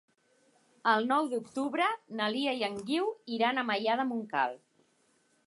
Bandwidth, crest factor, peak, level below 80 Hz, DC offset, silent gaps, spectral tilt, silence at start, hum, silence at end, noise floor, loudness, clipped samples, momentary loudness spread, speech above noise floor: 11.5 kHz; 18 dB; -14 dBFS; -82 dBFS; under 0.1%; none; -4.5 dB/octave; 0.85 s; none; 0.9 s; -70 dBFS; -31 LUFS; under 0.1%; 6 LU; 40 dB